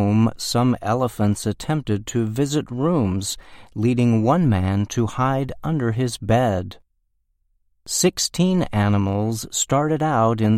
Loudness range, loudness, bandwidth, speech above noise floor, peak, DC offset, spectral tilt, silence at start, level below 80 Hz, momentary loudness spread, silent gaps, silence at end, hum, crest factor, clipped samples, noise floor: 3 LU; -21 LUFS; 15.5 kHz; 48 dB; -4 dBFS; under 0.1%; -5.5 dB/octave; 0 s; -46 dBFS; 6 LU; none; 0 s; none; 16 dB; under 0.1%; -68 dBFS